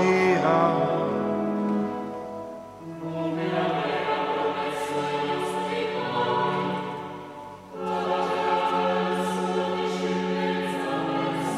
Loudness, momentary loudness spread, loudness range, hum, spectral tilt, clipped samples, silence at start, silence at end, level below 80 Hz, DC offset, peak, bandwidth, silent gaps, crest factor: -26 LUFS; 13 LU; 2 LU; none; -6 dB/octave; under 0.1%; 0 s; 0 s; -66 dBFS; under 0.1%; -8 dBFS; 14.5 kHz; none; 18 dB